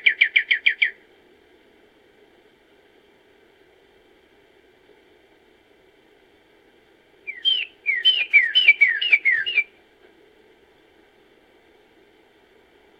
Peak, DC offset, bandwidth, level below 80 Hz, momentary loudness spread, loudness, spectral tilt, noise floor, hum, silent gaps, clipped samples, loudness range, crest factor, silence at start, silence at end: -2 dBFS; under 0.1%; 7.6 kHz; -74 dBFS; 10 LU; -17 LUFS; 0.5 dB/octave; -56 dBFS; none; none; under 0.1%; 12 LU; 22 dB; 0.05 s; 3.35 s